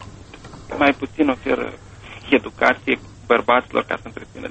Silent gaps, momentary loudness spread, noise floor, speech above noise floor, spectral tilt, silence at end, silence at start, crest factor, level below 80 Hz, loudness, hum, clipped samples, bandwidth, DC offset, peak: none; 23 LU; -39 dBFS; 20 dB; -5.5 dB/octave; 0 s; 0 s; 20 dB; -48 dBFS; -20 LUFS; none; under 0.1%; 8.4 kHz; under 0.1%; 0 dBFS